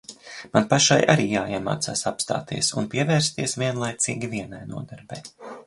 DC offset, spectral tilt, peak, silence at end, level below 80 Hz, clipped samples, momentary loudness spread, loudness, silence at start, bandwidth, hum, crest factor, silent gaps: under 0.1%; -4 dB/octave; -2 dBFS; 0.05 s; -56 dBFS; under 0.1%; 20 LU; -22 LUFS; 0.1 s; 11.5 kHz; none; 22 dB; none